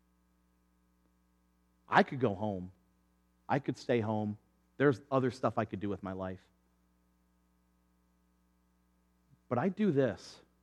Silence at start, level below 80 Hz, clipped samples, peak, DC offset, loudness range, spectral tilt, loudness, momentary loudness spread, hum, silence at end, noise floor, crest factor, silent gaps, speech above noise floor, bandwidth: 1.9 s; -74 dBFS; under 0.1%; -10 dBFS; under 0.1%; 10 LU; -7.5 dB/octave; -33 LUFS; 14 LU; none; 0.3 s; -72 dBFS; 26 dB; none; 40 dB; 11 kHz